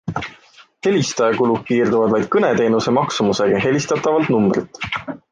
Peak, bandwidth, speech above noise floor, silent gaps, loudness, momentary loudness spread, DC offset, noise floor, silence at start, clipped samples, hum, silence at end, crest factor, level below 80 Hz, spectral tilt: -4 dBFS; 9.8 kHz; 31 dB; none; -18 LUFS; 9 LU; under 0.1%; -48 dBFS; 0.05 s; under 0.1%; none; 0.15 s; 14 dB; -52 dBFS; -5.5 dB/octave